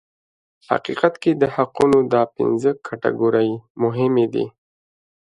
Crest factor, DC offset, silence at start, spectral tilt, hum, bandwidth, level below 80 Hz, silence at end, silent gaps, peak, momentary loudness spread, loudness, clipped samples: 20 dB; under 0.1%; 0.7 s; -7.5 dB/octave; none; 11 kHz; -58 dBFS; 0.8 s; 3.70-3.75 s; 0 dBFS; 7 LU; -19 LUFS; under 0.1%